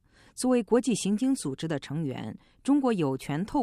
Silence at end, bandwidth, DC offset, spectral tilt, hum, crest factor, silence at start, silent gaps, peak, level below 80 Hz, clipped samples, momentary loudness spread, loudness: 0 s; 13.5 kHz; under 0.1%; -5.5 dB/octave; none; 16 dB; 0.35 s; none; -12 dBFS; -58 dBFS; under 0.1%; 11 LU; -28 LUFS